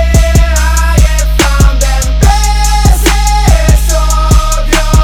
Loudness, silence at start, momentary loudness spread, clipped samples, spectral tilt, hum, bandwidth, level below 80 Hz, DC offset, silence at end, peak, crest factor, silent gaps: -9 LUFS; 0 s; 2 LU; 0.7%; -4.5 dB/octave; none; 16.5 kHz; -8 dBFS; under 0.1%; 0 s; 0 dBFS; 6 dB; none